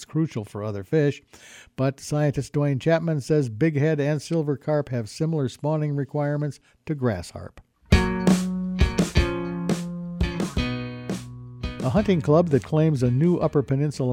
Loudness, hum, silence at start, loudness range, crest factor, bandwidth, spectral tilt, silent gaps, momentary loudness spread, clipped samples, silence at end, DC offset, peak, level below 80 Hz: -24 LUFS; none; 0 s; 4 LU; 20 dB; 15 kHz; -7 dB/octave; none; 12 LU; under 0.1%; 0 s; under 0.1%; -4 dBFS; -36 dBFS